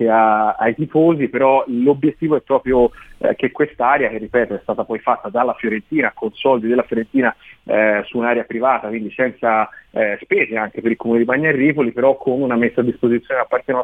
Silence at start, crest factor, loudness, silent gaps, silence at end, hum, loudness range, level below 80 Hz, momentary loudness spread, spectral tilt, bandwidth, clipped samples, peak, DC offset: 0 s; 16 dB; -17 LUFS; none; 0 s; none; 2 LU; -50 dBFS; 6 LU; -9 dB/octave; 3.9 kHz; under 0.1%; -2 dBFS; under 0.1%